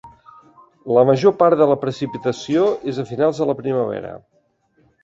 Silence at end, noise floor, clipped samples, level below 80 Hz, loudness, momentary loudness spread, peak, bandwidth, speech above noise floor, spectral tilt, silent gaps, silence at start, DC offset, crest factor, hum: 0.85 s; -61 dBFS; under 0.1%; -60 dBFS; -18 LUFS; 11 LU; -2 dBFS; 7.8 kHz; 44 dB; -7 dB/octave; none; 0.05 s; under 0.1%; 18 dB; none